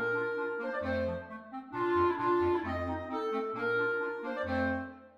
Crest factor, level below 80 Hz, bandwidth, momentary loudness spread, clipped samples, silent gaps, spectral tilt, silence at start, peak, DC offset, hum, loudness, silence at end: 16 dB; -58 dBFS; 6.8 kHz; 8 LU; under 0.1%; none; -7.5 dB/octave; 0 s; -18 dBFS; under 0.1%; none; -33 LUFS; 0.1 s